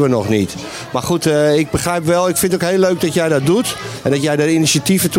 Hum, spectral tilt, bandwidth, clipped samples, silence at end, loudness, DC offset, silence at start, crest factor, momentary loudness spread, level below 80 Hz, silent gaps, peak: none; -4.5 dB/octave; 16.5 kHz; under 0.1%; 0 s; -15 LUFS; under 0.1%; 0 s; 12 dB; 8 LU; -46 dBFS; none; -2 dBFS